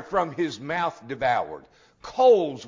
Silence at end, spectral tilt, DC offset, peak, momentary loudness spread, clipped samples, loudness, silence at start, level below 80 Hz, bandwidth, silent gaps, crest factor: 0 s; -5.5 dB/octave; under 0.1%; -8 dBFS; 18 LU; under 0.1%; -24 LUFS; 0 s; -60 dBFS; 7.6 kHz; none; 16 dB